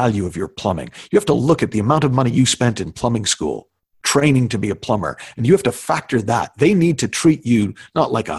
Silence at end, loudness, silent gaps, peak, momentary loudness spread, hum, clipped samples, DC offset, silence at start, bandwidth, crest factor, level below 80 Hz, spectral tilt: 0 s; -18 LUFS; none; 0 dBFS; 8 LU; none; under 0.1%; under 0.1%; 0 s; 12.5 kHz; 16 dB; -44 dBFS; -5.5 dB/octave